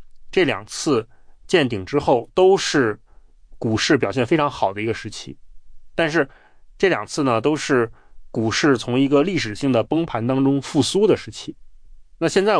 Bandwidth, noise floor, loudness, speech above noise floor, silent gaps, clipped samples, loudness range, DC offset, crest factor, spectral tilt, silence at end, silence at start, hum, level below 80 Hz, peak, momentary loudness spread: 10.5 kHz; -45 dBFS; -20 LUFS; 26 dB; none; under 0.1%; 3 LU; under 0.1%; 16 dB; -5 dB/octave; 0 s; 0 s; none; -48 dBFS; -4 dBFS; 11 LU